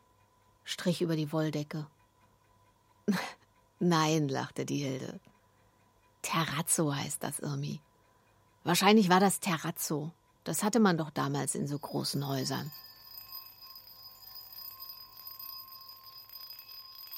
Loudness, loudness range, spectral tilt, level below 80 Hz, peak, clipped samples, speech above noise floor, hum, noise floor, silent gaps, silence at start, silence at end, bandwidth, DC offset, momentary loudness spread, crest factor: -31 LUFS; 16 LU; -4.5 dB/octave; -74 dBFS; -8 dBFS; under 0.1%; 36 dB; none; -67 dBFS; none; 0.65 s; 0 s; 16.5 kHz; under 0.1%; 20 LU; 26 dB